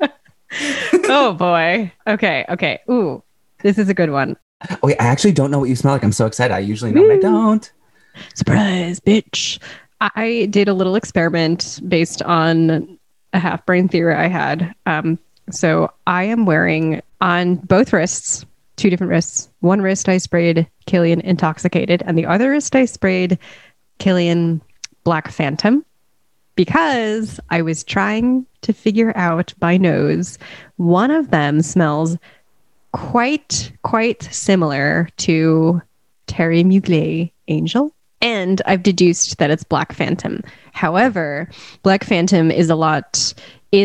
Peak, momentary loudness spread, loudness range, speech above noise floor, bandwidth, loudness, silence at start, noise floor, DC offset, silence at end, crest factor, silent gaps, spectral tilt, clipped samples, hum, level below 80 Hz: -2 dBFS; 8 LU; 3 LU; 52 dB; 11.5 kHz; -16 LUFS; 0 s; -67 dBFS; 0.1%; 0 s; 14 dB; 4.42-4.60 s; -5.5 dB/octave; under 0.1%; none; -50 dBFS